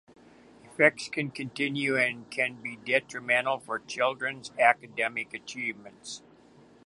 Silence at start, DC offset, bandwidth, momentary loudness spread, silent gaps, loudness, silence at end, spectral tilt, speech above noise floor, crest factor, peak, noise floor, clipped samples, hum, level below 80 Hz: 0.7 s; under 0.1%; 11.5 kHz; 15 LU; none; -28 LUFS; 0.65 s; -4 dB/octave; 27 dB; 24 dB; -6 dBFS; -56 dBFS; under 0.1%; none; -74 dBFS